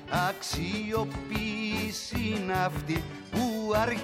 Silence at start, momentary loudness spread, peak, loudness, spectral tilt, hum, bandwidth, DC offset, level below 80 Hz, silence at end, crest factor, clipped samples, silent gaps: 0 s; 5 LU; -14 dBFS; -31 LUFS; -5 dB/octave; none; 16.5 kHz; under 0.1%; -46 dBFS; 0 s; 16 dB; under 0.1%; none